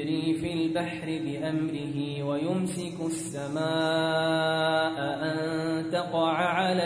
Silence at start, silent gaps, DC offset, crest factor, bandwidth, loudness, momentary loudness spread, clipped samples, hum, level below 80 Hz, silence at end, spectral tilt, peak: 0 s; none; under 0.1%; 16 dB; 10.5 kHz; -28 LUFS; 7 LU; under 0.1%; none; -64 dBFS; 0 s; -5.5 dB/octave; -12 dBFS